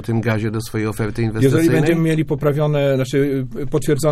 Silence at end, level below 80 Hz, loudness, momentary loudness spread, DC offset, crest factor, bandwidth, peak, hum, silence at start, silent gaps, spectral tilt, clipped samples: 0 s; -38 dBFS; -18 LUFS; 7 LU; under 0.1%; 14 dB; 15.5 kHz; -2 dBFS; none; 0 s; none; -7 dB/octave; under 0.1%